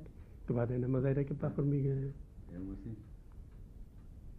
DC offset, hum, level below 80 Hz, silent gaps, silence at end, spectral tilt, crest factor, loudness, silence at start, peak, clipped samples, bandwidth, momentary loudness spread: under 0.1%; none; -52 dBFS; none; 0 s; -11.5 dB/octave; 16 dB; -36 LUFS; 0 s; -20 dBFS; under 0.1%; 2.8 kHz; 22 LU